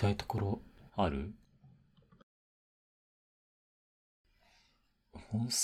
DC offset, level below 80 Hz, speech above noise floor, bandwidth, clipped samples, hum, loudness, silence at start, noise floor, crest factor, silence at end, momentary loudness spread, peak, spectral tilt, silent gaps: under 0.1%; -56 dBFS; 40 dB; 15.5 kHz; under 0.1%; none; -37 LUFS; 0 s; -74 dBFS; 22 dB; 0 s; 22 LU; -18 dBFS; -4.5 dB/octave; 2.23-4.24 s